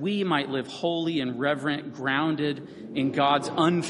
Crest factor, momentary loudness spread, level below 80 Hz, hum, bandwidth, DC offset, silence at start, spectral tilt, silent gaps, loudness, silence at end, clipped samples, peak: 18 dB; 7 LU; -68 dBFS; none; 11.5 kHz; under 0.1%; 0 s; -5.5 dB/octave; none; -26 LUFS; 0 s; under 0.1%; -8 dBFS